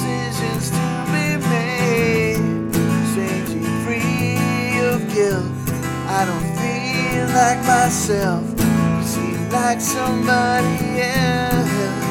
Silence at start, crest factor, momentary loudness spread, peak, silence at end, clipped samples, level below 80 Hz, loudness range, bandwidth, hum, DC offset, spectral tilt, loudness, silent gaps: 0 s; 16 dB; 6 LU; -2 dBFS; 0 s; under 0.1%; -40 dBFS; 2 LU; 18 kHz; none; under 0.1%; -5 dB/octave; -19 LUFS; none